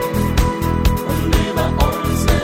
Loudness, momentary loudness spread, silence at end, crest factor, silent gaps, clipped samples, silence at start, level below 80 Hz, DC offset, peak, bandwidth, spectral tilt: -18 LUFS; 1 LU; 0 s; 14 dB; none; under 0.1%; 0 s; -20 dBFS; under 0.1%; -2 dBFS; 17 kHz; -6 dB/octave